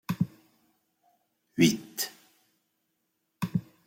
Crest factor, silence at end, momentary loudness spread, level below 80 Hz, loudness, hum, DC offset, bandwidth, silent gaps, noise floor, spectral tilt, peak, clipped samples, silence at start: 24 dB; 0.25 s; 12 LU; -68 dBFS; -30 LUFS; none; under 0.1%; 16.5 kHz; none; -78 dBFS; -4.5 dB/octave; -8 dBFS; under 0.1%; 0.1 s